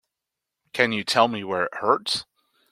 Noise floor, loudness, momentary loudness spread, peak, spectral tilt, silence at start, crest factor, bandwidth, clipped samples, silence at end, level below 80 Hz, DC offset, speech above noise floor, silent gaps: -85 dBFS; -23 LUFS; 7 LU; -2 dBFS; -3.5 dB/octave; 0.75 s; 24 dB; 16 kHz; under 0.1%; 0.5 s; -68 dBFS; under 0.1%; 62 dB; none